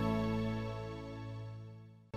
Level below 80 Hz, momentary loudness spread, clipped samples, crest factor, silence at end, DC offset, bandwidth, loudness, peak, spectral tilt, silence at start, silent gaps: -54 dBFS; 16 LU; under 0.1%; 18 dB; 0 s; under 0.1%; 12.5 kHz; -40 LUFS; -22 dBFS; -8 dB/octave; 0 s; none